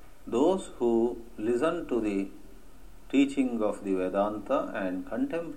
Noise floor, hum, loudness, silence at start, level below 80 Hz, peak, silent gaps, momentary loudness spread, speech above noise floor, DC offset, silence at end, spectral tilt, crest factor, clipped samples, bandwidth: -52 dBFS; none; -29 LUFS; 0.25 s; -54 dBFS; -12 dBFS; none; 7 LU; 24 dB; 0.5%; 0 s; -6 dB/octave; 16 dB; under 0.1%; 13 kHz